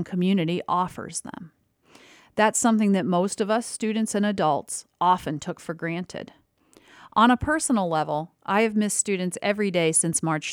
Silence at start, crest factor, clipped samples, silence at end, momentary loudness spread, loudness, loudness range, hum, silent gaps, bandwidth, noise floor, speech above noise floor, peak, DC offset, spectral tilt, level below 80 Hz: 0 s; 18 dB; under 0.1%; 0 s; 13 LU; -24 LUFS; 3 LU; none; none; 16.5 kHz; -58 dBFS; 34 dB; -6 dBFS; under 0.1%; -4.5 dB/octave; -54 dBFS